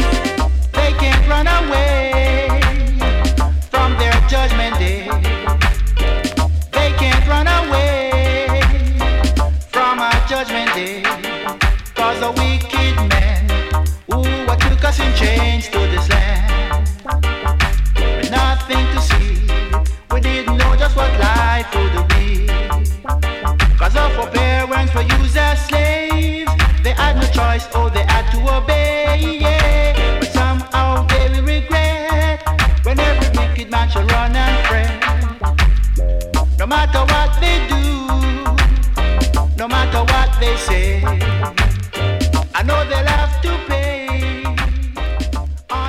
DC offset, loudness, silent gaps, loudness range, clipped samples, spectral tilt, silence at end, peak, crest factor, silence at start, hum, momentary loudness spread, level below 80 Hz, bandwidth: under 0.1%; -16 LUFS; none; 2 LU; under 0.1%; -5.5 dB/octave; 0 s; -4 dBFS; 10 dB; 0 s; none; 5 LU; -16 dBFS; 15 kHz